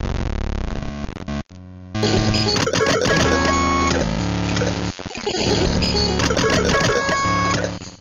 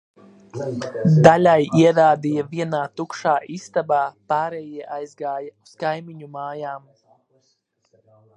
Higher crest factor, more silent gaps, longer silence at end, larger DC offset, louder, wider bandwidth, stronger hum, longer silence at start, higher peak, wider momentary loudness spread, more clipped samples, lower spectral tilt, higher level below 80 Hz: second, 14 dB vs 20 dB; neither; second, 0.05 s vs 1.6 s; neither; about the same, -19 LUFS vs -19 LUFS; first, 15 kHz vs 9.8 kHz; neither; second, 0 s vs 0.55 s; second, -6 dBFS vs 0 dBFS; second, 12 LU vs 19 LU; neither; second, -4.5 dB/octave vs -7 dB/octave; first, -30 dBFS vs -60 dBFS